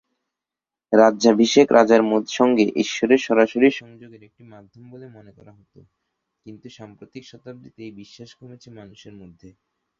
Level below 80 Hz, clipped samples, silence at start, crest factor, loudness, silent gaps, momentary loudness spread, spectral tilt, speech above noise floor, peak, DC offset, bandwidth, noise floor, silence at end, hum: -64 dBFS; under 0.1%; 0.9 s; 20 dB; -17 LUFS; none; 26 LU; -4.5 dB/octave; 68 dB; -2 dBFS; under 0.1%; 7.2 kHz; -89 dBFS; 1.2 s; none